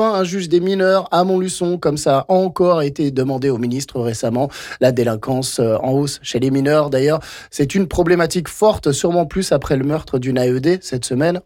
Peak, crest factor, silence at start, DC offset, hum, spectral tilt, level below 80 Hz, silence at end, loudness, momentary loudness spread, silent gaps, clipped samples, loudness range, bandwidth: -4 dBFS; 12 dB; 0 s; under 0.1%; none; -5.5 dB/octave; -42 dBFS; 0.05 s; -17 LUFS; 6 LU; none; under 0.1%; 2 LU; 17 kHz